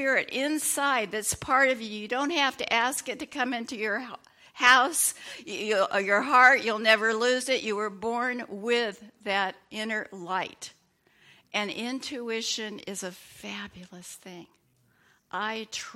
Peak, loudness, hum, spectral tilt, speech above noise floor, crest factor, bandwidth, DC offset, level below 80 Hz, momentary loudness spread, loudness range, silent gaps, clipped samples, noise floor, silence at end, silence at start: -4 dBFS; -26 LUFS; none; -1.5 dB/octave; 39 dB; 24 dB; 16.5 kHz; under 0.1%; -66 dBFS; 19 LU; 12 LU; none; under 0.1%; -66 dBFS; 0 s; 0 s